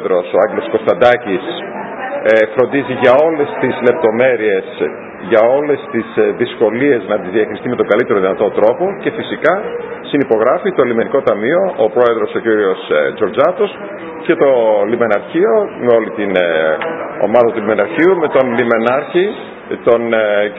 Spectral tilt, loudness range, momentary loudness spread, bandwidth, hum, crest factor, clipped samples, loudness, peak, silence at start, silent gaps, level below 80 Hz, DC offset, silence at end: -8 dB/octave; 1 LU; 8 LU; 5.8 kHz; none; 14 dB; 0.1%; -14 LUFS; 0 dBFS; 0 s; none; -56 dBFS; under 0.1%; 0 s